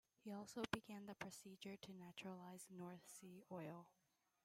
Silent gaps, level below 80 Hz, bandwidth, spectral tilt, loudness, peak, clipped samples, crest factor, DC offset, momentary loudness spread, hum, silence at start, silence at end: none; -82 dBFS; 16 kHz; -4.5 dB/octave; -55 LUFS; -22 dBFS; under 0.1%; 32 dB; under 0.1%; 10 LU; none; 0.25 s; 0.55 s